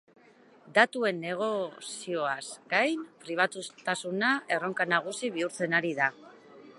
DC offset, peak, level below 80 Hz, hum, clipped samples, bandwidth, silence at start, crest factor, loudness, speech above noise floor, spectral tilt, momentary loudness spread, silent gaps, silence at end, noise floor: under 0.1%; -6 dBFS; -84 dBFS; none; under 0.1%; 11.5 kHz; 0.65 s; 26 dB; -29 LUFS; 28 dB; -3.5 dB/octave; 10 LU; none; 0.05 s; -58 dBFS